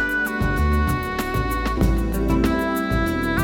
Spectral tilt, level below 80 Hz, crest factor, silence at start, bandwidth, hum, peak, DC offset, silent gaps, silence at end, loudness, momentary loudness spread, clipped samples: -6.5 dB/octave; -26 dBFS; 14 dB; 0 s; 19.5 kHz; none; -6 dBFS; under 0.1%; none; 0 s; -22 LUFS; 3 LU; under 0.1%